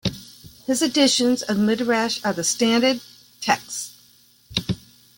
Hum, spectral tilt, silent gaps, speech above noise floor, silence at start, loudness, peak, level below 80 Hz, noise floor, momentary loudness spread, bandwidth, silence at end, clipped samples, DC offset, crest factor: none; -3 dB/octave; none; 34 dB; 0.05 s; -21 LUFS; -4 dBFS; -54 dBFS; -55 dBFS; 14 LU; 17 kHz; 0.4 s; under 0.1%; under 0.1%; 20 dB